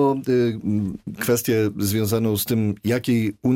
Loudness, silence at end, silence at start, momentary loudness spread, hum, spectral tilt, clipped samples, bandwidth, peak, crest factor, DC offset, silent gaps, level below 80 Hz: -22 LUFS; 0 s; 0 s; 5 LU; none; -6 dB/octave; under 0.1%; 16.5 kHz; -8 dBFS; 12 dB; under 0.1%; none; -56 dBFS